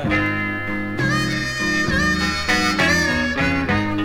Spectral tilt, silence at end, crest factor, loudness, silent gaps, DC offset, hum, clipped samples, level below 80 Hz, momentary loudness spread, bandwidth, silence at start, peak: -4.5 dB/octave; 0 s; 14 dB; -19 LUFS; none; under 0.1%; none; under 0.1%; -36 dBFS; 6 LU; 17 kHz; 0 s; -6 dBFS